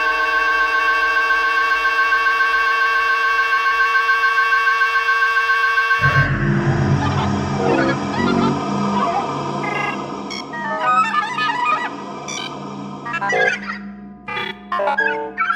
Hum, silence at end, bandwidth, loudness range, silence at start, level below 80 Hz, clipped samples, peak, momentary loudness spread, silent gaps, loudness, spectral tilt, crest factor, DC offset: none; 0 s; 16 kHz; 6 LU; 0 s; -44 dBFS; under 0.1%; -2 dBFS; 12 LU; none; -17 LUFS; -5 dB/octave; 16 dB; under 0.1%